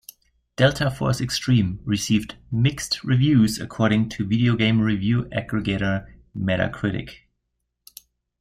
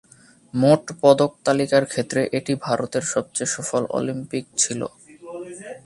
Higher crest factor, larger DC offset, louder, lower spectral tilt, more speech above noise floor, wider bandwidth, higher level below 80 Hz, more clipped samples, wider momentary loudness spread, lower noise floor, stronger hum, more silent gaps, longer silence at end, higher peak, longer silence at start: about the same, 18 dB vs 22 dB; neither; about the same, -22 LUFS vs -21 LUFS; first, -6 dB/octave vs -4.5 dB/octave; first, 56 dB vs 30 dB; first, 15 kHz vs 11.5 kHz; first, -46 dBFS vs -62 dBFS; neither; second, 9 LU vs 16 LU; first, -77 dBFS vs -50 dBFS; neither; neither; first, 1.25 s vs 0.1 s; second, -6 dBFS vs 0 dBFS; about the same, 0.6 s vs 0.55 s